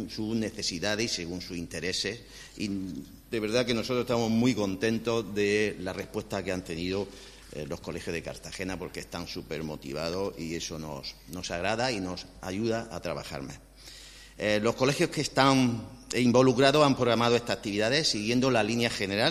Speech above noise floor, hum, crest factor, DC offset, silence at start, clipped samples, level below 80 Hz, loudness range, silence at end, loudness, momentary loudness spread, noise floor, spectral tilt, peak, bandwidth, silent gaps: 20 dB; none; 24 dB; under 0.1%; 0 s; under 0.1%; -54 dBFS; 11 LU; 0 s; -29 LUFS; 15 LU; -49 dBFS; -4.5 dB/octave; -6 dBFS; 14.5 kHz; none